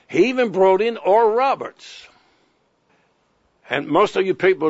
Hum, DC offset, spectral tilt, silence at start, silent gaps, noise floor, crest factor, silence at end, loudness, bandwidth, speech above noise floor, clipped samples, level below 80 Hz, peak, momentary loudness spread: none; under 0.1%; -5.5 dB/octave; 0.1 s; none; -64 dBFS; 16 dB; 0 s; -18 LUFS; 8 kHz; 46 dB; under 0.1%; -66 dBFS; -4 dBFS; 12 LU